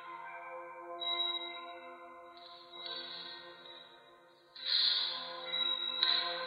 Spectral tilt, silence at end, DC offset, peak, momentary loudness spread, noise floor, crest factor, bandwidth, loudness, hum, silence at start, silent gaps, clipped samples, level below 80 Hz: -2.5 dB/octave; 0 s; under 0.1%; -14 dBFS; 22 LU; -61 dBFS; 26 dB; 10.5 kHz; -33 LUFS; none; 0 s; none; under 0.1%; under -90 dBFS